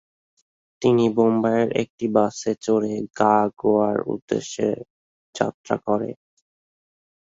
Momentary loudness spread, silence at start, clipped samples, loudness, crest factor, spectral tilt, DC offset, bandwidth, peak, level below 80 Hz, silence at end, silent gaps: 8 LU; 0.8 s; under 0.1%; -22 LUFS; 20 dB; -6 dB/octave; under 0.1%; 7.8 kHz; -4 dBFS; -62 dBFS; 1.25 s; 1.90-1.98 s, 4.22-4.28 s, 4.90-5.33 s, 5.54-5.64 s